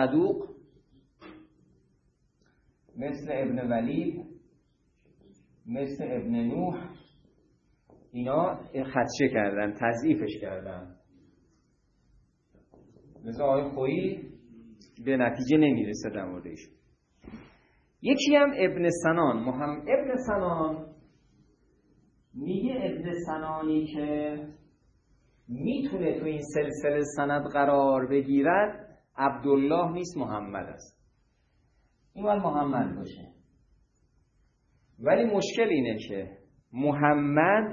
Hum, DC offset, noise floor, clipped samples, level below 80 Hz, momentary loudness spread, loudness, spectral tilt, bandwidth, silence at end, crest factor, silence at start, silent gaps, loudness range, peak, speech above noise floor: none; under 0.1%; -69 dBFS; under 0.1%; -60 dBFS; 19 LU; -28 LUFS; -6 dB/octave; 9.8 kHz; 0 s; 22 dB; 0 s; none; 8 LU; -8 dBFS; 41 dB